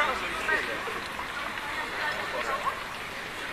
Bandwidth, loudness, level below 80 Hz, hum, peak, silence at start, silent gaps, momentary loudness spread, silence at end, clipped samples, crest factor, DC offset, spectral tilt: 14 kHz; -31 LUFS; -54 dBFS; none; -12 dBFS; 0 s; none; 8 LU; 0 s; under 0.1%; 20 dB; under 0.1%; -2.5 dB/octave